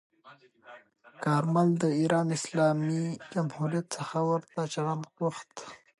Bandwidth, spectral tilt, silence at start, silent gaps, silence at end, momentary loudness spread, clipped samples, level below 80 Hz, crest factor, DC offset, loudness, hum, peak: 11.5 kHz; -6.5 dB/octave; 0.25 s; none; 0.25 s; 8 LU; under 0.1%; -76 dBFS; 18 dB; under 0.1%; -29 LUFS; none; -12 dBFS